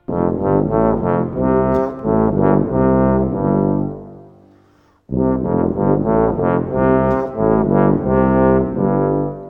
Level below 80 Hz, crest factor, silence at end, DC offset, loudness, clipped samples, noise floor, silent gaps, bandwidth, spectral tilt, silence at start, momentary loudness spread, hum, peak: -34 dBFS; 14 dB; 0 s; under 0.1%; -16 LUFS; under 0.1%; -53 dBFS; none; 3.5 kHz; -12 dB/octave; 0.1 s; 5 LU; none; -2 dBFS